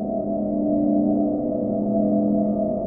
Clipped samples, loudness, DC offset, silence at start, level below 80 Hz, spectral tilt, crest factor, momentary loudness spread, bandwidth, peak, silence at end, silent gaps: under 0.1%; -22 LUFS; under 0.1%; 0 s; -48 dBFS; -15.5 dB/octave; 12 dB; 4 LU; 1.5 kHz; -10 dBFS; 0 s; none